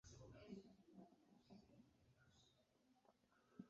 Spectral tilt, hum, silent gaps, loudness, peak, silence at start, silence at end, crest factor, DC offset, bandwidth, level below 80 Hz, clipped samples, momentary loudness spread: -6.5 dB/octave; none; none; -65 LUFS; -44 dBFS; 0.05 s; 0 s; 22 dB; under 0.1%; 7.4 kHz; -82 dBFS; under 0.1%; 8 LU